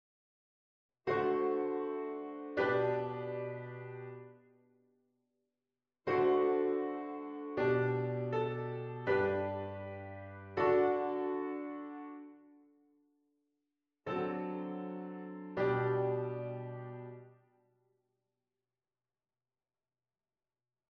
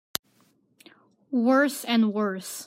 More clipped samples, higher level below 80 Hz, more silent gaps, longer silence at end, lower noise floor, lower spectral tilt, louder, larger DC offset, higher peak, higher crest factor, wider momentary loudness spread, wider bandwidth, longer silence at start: neither; about the same, -74 dBFS vs -74 dBFS; neither; first, 3.6 s vs 0 s; first, under -90 dBFS vs -65 dBFS; first, -9 dB/octave vs -4 dB/octave; second, -36 LUFS vs -25 LUFS; neither; second, -20 dBFS vs -2 dBFS; second, 18 dB vs 24 dB; first, 16 LU vs 12 LU; second, 5.6 kHz vs 16 kHz; second, 1.05 s vs 1.3 s